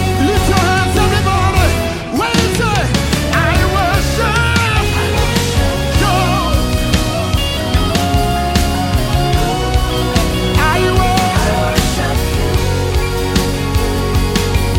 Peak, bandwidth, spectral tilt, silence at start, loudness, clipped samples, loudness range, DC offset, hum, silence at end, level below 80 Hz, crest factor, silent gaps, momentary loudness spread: 0 dBFS; 17 kHz; -5 dB/octave; 0 s; -14 LUFS; under 0.1%; 1 LU; under 0.1%; none; 0 s; -20 dBFS; 14 dB; none; 3 LU